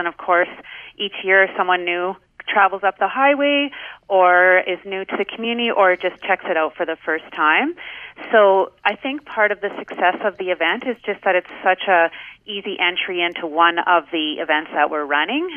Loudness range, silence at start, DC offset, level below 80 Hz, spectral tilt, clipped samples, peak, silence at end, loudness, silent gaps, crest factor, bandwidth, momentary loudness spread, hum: 3 LU; 0 s; under 0.1%; -66 dBFS; -6 dB/octave; under 0.1%; 0 dBFS; 0 s; -18 LUFS; none; 18 dB; 3.6 kHz; 12 LU; none